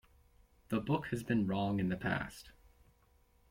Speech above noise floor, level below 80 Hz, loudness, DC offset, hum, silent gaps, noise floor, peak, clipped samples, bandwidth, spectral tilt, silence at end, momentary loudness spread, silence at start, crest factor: 34 dB; -60 dBFS; -36 LUFS; under 0.1%; none; none; -69 dBFS; -20 dBFS; under 0.1%; 16.5 kHz; -7 dB/octave; 1 s; 6 LU; 0.7 s; 18 dB